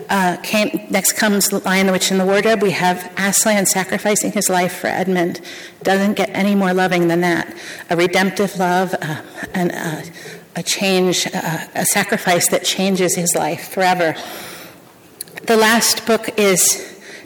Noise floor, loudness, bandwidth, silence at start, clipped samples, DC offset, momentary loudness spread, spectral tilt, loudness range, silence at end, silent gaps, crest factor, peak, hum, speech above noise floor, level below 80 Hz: -43 dBFS; -16 LUFS; 19.5 kHz; 0 s; under 0.1%; under 0.1%; 14 LU; -3.5 dB/octave; 4 LU; 0 s; none; 12 dB; -4 dBFS; none; 26 dB; -60 dBFS